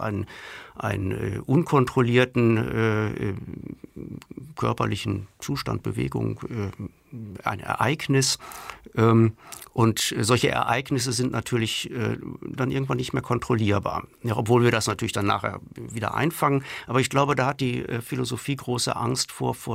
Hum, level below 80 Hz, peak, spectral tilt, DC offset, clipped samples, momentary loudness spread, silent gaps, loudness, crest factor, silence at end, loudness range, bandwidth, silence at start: none; -52 dBFS; -8 dBFS; -5 dB/octave; under 0.1%; under 0.1%; 16 LU; none; -25 LUFS; 18 dB; 0 s; 6 LU; 16 kHz; 0 s